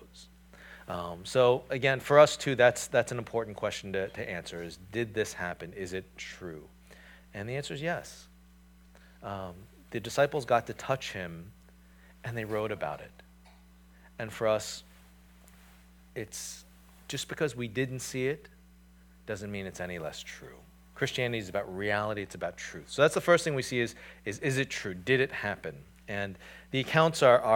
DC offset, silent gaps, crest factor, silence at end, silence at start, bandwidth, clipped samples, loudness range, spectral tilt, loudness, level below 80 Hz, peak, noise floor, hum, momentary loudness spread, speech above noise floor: under 0.1%; none; 26 dB; 0 s; 0 s; 19 kHz; under 0.1%; 12 LU; -4.5 dB/octave; -31 LUFS; -60 dBFS; -6 dBFS; -57 dBFS; none; 19 LU; 27 dB